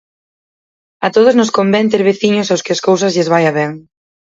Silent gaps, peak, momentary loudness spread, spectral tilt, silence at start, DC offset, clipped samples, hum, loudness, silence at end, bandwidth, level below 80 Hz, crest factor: none; 0 dBFS; 9 LU; -5 dB/octave; 1 s; under 0.1%; under 0.1%; none; -13 LUFS; 0.45 s; 7.8 kHz; -60 dBFS; 14 dB